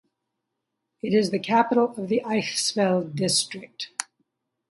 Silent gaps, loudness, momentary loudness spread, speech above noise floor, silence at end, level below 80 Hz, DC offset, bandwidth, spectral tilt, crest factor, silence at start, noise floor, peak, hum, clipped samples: none; -24 LUFS; 12 LU; 58 dB; 0.65 s; -70 dBFS; under 0.1%; 11.5 kHz; -4 dB/octave; 20 dB; 1.05 s; -81 dBFS; -6 dBFS; none; under 0.1%